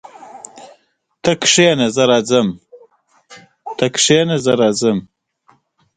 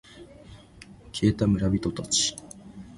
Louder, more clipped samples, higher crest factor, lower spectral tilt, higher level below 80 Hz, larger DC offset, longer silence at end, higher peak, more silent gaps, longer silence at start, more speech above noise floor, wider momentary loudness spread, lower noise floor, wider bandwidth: first, -14 LUFS vs -25 LUFS; neither; about the same, 18 dB vs 20 dB; about the same, -3.5 dB/octave vs -4.5 dB/octave; second, -56 dBFS vs -46 dBFS; neither; first, 0.9 s vs 0 s; first, 0 dBFS vs -8 dBFS; neither; about the same, 0.25 s vs 0.15 s; first, 46 dB vs 25 dB; first, 24 LU vs 20 LU; first, -60 dBFS vs -49 dBFS; second, 9.6 kHz vs 11.5 kHz